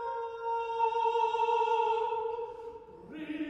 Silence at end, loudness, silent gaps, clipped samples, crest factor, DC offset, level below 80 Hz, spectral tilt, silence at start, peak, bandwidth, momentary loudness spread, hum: 0 s; -31 LUFS; none; under 0.1%; 14 dB; under 0.1%; -68 dBFS; -4.5 dB/octave; 0 s; -18 dBFS; 8 kHz; 17 LU; none